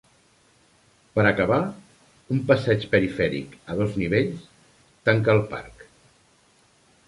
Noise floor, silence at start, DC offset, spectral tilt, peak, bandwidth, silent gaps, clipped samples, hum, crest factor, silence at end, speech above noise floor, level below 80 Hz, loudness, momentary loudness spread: -60 dBFS; 1.15 s; under 0.1%; -7.5 dB/octave; -4 dBFS; 11.5 kHz; none; under 0.1%; none; 20 dB; 1.35 s; 38 dB; -52 dBFS; -23 LUFS; 12 LU